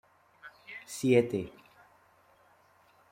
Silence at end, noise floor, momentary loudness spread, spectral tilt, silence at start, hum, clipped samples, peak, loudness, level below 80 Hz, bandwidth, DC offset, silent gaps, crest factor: 1.65 s; -64 dBFS; 26 LU; -6 dB/octave; 0.45 s; none; under 0.1%; -10 dBFS; -29 LUFS; -70 dBFS; 16 kHz; under 0.1%; none; 24 dB